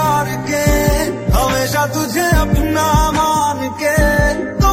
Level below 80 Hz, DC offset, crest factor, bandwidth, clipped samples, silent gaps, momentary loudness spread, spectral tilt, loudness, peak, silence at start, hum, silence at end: -22 dBFS; under 0.1%; 14 dB; 16.5 kHz; under 0.1%; none; 4 LU; -5 dB/octave; -15 LUFS; 0 dBFS; 0 s; none; 0 s